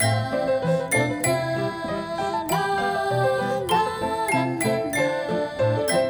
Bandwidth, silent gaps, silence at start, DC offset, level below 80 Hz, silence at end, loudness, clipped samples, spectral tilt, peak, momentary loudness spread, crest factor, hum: over 20 kHz; none; 0 s; under 0.1%; -54 dBFS; 0 s; -24 LUFS; under 0.1%; -4.5 dB/octave; -8 dBFS; 5 LU; 16 dB; none